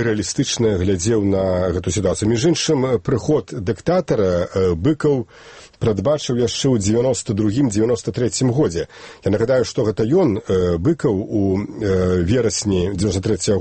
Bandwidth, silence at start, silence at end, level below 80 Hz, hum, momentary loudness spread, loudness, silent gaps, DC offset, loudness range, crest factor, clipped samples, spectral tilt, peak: 8.8 kHz; 0 s; 0 s; -42 dBFS; none; 4 LU; -19 LUFS; none; under 0.1%; 1 LU; 12 dB; under 0.1%; -5.5 dB/octave; -6 dBFS